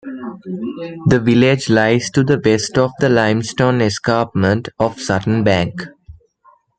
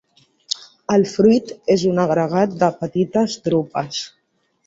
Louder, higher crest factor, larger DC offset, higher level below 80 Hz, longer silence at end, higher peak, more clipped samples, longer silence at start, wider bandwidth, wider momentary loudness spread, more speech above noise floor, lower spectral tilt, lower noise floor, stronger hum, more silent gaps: first, -16 LUFS vs -19 LUFS; about the same, 14 dB vs 16 dB; neither; first, -48 dBFS vs -58 dBFS; about the same, 0.65 s vs 0.6 s; about the same, -2 dBFS vs -2 dBFS; neither; second, 0.05 s vs 0.6 s; first, 9.4 kHz vs 8 kHz; about the same, 13 LU vs 12 LU; second, 38 dB vs 49 dB; about the same, -6 dB/octave vs -6 dB/octave; second, -53 dBFS vs -66 dBFS; neither; neither